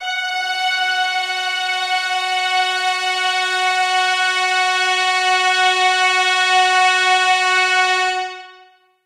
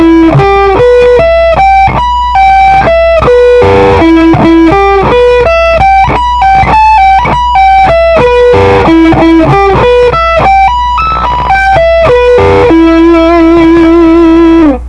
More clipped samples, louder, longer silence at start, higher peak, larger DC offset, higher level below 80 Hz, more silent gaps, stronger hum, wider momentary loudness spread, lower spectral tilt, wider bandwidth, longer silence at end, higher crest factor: second, under 0.1% vs 8%; second, -15 LUFS vs -4 LUFS; about the same, 0 s vs 0 s; second, -4 dBFS vs 0 dBFS; second, under 0.1% vs 0.3%; second, -72 dBFS vs -18 dBFS; neither; neither; first, 6 LU vs 3 LU; second, 2.5 dB/octave vs -7 dB/octave; first, 14 kHz vs 9.2 kHz; first, 0.55 s vs 0 s; first, 14 dB vs 4 dB